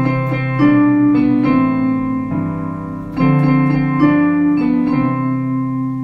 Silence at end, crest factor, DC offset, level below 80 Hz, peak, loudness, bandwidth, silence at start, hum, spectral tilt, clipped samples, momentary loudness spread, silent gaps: 0 s; 12 dB; under 0.1%; -42 dBFS; -2 dBFS; -15 LUFS; 5.4 kHz; 0 s; none; -10 dB/octave; under 0.1%; 8 LU; none